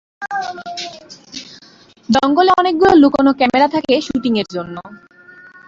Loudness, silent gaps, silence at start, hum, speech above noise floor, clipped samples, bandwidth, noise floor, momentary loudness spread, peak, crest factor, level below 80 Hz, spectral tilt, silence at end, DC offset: -14 LUFS; none; 0.2 s; none; 32 dB; under 0.1%; 7.6 kHz; -46 dBFS; 21 LU; 0 dBFS; 16 dB; -48 dBFS; -5 dB/octave; 0.75 s; under 0.1%